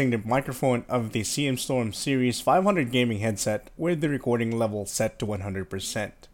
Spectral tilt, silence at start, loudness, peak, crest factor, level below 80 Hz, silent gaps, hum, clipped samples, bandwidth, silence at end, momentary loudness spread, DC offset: -5 dB/octave; 0 s; -26 LUFS; -10 dBFS; 16 dB; -54 dBFS; none; none; under 0.1%; 17 kHz; 0.1 s; 8 LU; under 0.1%